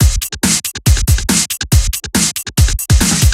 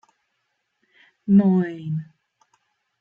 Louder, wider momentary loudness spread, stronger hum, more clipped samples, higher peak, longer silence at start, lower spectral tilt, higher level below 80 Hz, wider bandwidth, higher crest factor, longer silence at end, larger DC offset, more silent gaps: first, -13 LUFS vs -21 LUFS; second, 3 LU vs 14 LU; neither; neither; first, 0 dBFS vs -6 dBFS; second, 0 s vs 1.25 s; second, -3.5 dB/octave vs -11 dB/octave; first, -16 dBFS vs -66 dBFS; first, 16.5 kHz vs 3.5 kHz; second, 12 dB vs 18 dB; second, 0 s vs 0.95 s; neither; neither